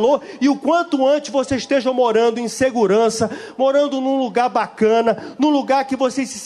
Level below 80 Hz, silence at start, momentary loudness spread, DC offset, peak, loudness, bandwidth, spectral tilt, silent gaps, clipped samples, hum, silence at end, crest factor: -56 dBFS; 0 s; 5 LU; under 0.1%; -4 dBFS; -18 LUFS; 12.5 kHz; -4.5 dB/octave; none; under 0.1%; none; 0 s; 14 dB